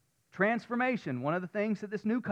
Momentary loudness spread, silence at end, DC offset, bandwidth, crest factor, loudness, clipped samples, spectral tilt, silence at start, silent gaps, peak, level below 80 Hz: 4 LU; 0 s; under 0.1%; 8.4 kHz; 18 dB; -32 LUFS; under 0.1%; -7.5 dB/octave; 0.35 s; none; -14 dBFS; -80 dBFS